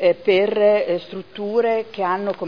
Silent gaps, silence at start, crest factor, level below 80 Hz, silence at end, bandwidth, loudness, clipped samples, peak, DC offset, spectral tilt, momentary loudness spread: none; 0 s; 14 dB; -66 dBFS; 0 s; 5.4 kHz; -19 LUFS; under 0.1%; -4 dBFS; 0.4%; -7 dB/octave; 10 LU